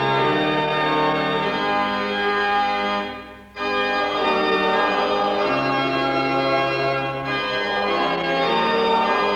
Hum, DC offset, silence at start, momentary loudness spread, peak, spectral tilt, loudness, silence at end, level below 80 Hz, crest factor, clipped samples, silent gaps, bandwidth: none; under 0.1%; 0 s; 5 LU; -8 dBFS; -5.5 dB/octave; -20 LUFS; 0 s; -52 dBFS; 12 dB; under 0.1%; none; 17.5 kHz